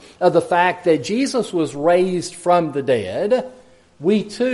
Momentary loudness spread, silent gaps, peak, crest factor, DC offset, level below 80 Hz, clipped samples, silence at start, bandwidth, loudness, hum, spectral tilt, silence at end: 5 LU; none; -2 dBFS; 16 dB; under 0.1%; -60 dBFS; under 0.1%; 0.2 s; 11.5 kHz; -19 LUFS; none; -5.5 dB/octave; 0 s